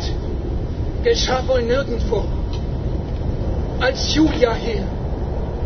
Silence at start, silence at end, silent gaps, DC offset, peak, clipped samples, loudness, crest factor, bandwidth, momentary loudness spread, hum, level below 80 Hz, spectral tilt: 0 s; 0 s; none; under 0.1%; -2 dBFS; under 0.1%; -21 LUFS; 18 dB; 6.6 kHz; 8 LU; none; -24 dBFS; -5.5 dB/octave